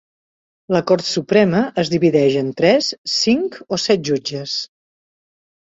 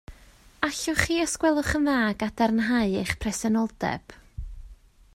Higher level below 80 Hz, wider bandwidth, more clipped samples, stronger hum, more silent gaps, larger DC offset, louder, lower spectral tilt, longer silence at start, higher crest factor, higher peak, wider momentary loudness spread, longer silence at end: second, -58 dBFS vs -44 dBFS; second, 7.8 kHz vs 16 kHz; neither; neither; first, 2.98-3.04 s vs none; neither; first, -17 LUFS vs -25 LUFS; about the same, -5 dB/octave vs -4 dB/octave; first, 0.7 s vs 0.1 s; second, 16 dB vs 22 dB; about the same, -2 dBFS vs -4 dBFS; second, 8 LU vs 18 LU; first, 0.95 s vs 0.4 s